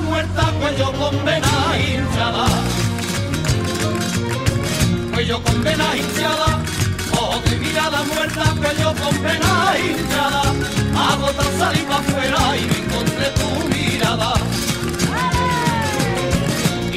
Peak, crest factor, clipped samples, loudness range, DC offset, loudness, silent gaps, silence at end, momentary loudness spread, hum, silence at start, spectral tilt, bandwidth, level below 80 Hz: -2 dBFS; 16 dB; under 0.1%; 2 LU; 0.3%; -18 LUFS; none; 0 s; 3 LU; none; 0 s; -4.5 dB/octave; 16 kHz; -32 dBFS